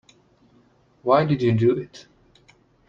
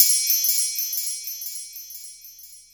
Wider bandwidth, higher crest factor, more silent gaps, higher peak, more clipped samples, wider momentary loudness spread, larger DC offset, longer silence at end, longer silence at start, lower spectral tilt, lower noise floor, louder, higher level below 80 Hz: second, 7.2 kHz vs over 20 kHz; second, 18 dB vs 24 dB; neither; second, -6 dBFS vs 0 dBFS; neither; second, 12 LU vs 23 LU; neither; first, 0.9 s vs 0.15 s; first, 1.05 s vs 0 s; first, -8.5 dB/octave vs 7.5 dB/octave; first, -58 dBFS vs -45 dBFS; about the same, -21 LUFS vs -21 LUFS; first, -60 dBFS vs -72 dBFS